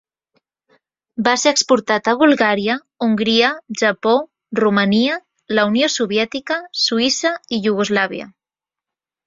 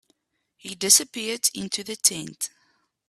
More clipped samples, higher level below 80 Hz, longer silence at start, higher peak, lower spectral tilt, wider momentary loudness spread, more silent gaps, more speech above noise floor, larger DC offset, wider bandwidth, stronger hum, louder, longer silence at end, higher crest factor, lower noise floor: neither; first, -62 dBFS vs -70 dBFS; first, 1.15 s vs 0.65 s; about the same, 0 dBFS vs 0 dBFS; first, -3.5 dB/octave vs -0.5 dB/octave; second, 8 LU vs 16 LU; neither; first, 72 dB vs 46 dB; neither; second, 7.8 kHz vs 15.5 kHz; neither; first, -17 LUFS vs -22 LUFS; first, 0.95 s vs 0.6 s; second, 18 dB vs 26 dB; first, -88 dBFS vs -71 dBFS